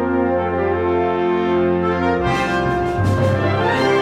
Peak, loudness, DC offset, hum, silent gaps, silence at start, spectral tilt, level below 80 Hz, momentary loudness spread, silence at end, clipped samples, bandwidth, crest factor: -4 dBFS; -18 LUFS; under 0.1%; none; none; 0 s; -7 dB/octave; -38 dBFS; 2 LU; 0 s; under 0.1%; 11 kHz; 12 dB